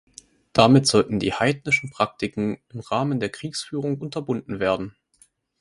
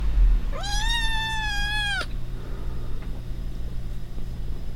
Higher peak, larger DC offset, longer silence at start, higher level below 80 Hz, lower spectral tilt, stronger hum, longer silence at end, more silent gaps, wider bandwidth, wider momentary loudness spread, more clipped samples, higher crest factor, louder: first, 0 dBFS vs -10 dBFS; neither; first, 0.55 s vs 0 s; second, -54 dBFS vs -26 dBFS; first, -5 dB/octave vs -3 dB/octave; neither; first, 0.7 s vs 0 s; neither; about the same, 11.5 kHz vs 12.5 kHz; about the same, 13 LU vs 12 LU; neither; first, 24 dB vs 14 dB; first, -22 LUFS vs -29 LUFS